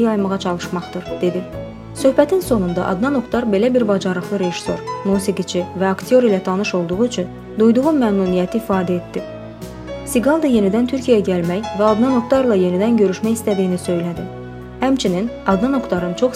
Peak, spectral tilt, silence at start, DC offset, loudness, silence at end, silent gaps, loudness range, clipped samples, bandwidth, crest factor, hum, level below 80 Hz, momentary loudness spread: 0 dBFS; -6.5 dB/octave; 0 s; under 0.1%; -18 LUFS; 0 s; none; 3 LU; under 0.1%; 15.5 kHz; 18 dB; none; -44 dBFS; 12 LU